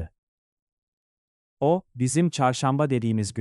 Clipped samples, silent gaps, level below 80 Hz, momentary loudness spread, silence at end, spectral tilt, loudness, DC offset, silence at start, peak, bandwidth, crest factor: under 0.1%; 0.18-1.57 s; -56 dBFS; 4 LU; 0 s; -6 dB/octave; -24 LUFS; under 0.1%; 0 s; -8 dBFS; 12 kHz; 18 dB